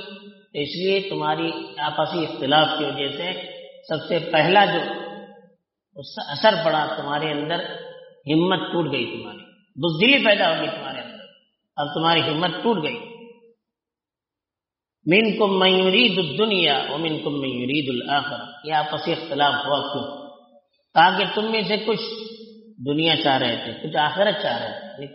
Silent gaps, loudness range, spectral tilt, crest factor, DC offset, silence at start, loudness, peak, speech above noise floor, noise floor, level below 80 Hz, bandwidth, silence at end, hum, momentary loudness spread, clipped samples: none; 5 LU; -2 dB/octave; 20 dB; under 0.1%; 0 s; -21 LUFS; -2 dBFS; 67 dB; -89 dBFS; -68 dBFS; 6 kHz; 0 s; none; 18 LU; under 0.1%